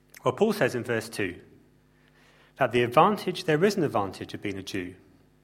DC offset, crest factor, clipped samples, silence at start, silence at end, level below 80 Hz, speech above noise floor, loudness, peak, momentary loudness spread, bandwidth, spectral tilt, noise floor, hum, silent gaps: under 0.1%; 22 dB; under 0.1%; 0.25 s; 0.5 s; -64 dBFS; 35 dB; -26 LUFS; -4 dBFS; 13 LU; 16.5 kHz; -5.5 dB/octave; -61 dBFS; none; none